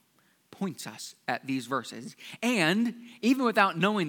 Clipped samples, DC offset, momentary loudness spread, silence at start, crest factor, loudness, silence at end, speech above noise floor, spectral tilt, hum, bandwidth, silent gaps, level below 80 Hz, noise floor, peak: under 0.1%; under 0.1%; 15 LU; 0.6 s; 22 dB; -28 LUFS; 0 s; 39 dB; -4.5 dB/octave; none; 19 kHz; none; -88 dBFS; -67 dBFS; -6 dBFS